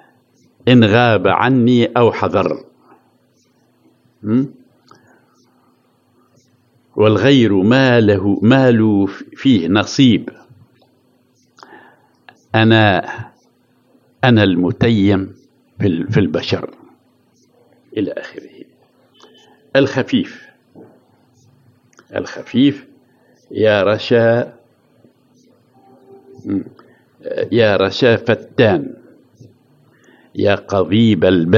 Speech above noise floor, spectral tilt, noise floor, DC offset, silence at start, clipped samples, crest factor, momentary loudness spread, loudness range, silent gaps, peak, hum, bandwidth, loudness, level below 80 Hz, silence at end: 44 dB; -7 dB/octave; -57 dBFS; under 0.1%; 0.65 s; under 0.1%; 16 dB; 17 LU; 10 LU; none; 0 dBFS; none; 7.4 kHz; -14 LUFS; -56 dBFS; 0 s